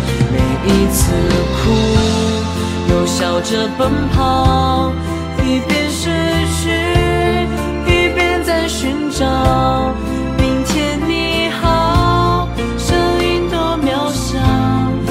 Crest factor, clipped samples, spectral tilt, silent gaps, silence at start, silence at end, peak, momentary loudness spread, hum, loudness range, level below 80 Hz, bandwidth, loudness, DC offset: 14 dB; under 0.1%; -5.5 dB/octave; none; 0 s; 0 s; 0 dBFS; 5 LU; none; 1 LU; -24 dBFS; 16 kHz; -15 LUFS; under 0.1%